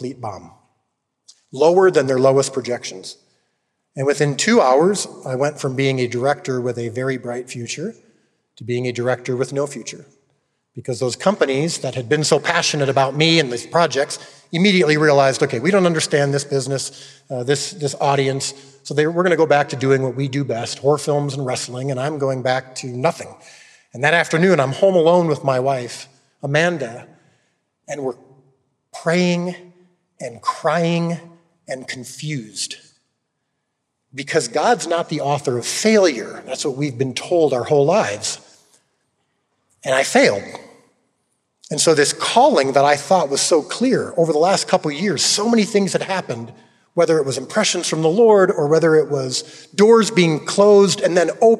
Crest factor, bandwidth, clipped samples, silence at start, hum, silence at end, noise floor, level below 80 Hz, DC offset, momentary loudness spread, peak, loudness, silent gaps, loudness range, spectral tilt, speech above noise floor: 18 dB; 13.5 kHz; under 0.1%; 0 s; none; 0 s; -74 dBFS; -72 dBFS; under 0.1%; 15 LU; 0 dBFS; -18 LUFS; none; 8 LU; -4.5 dB/octave; 57 dB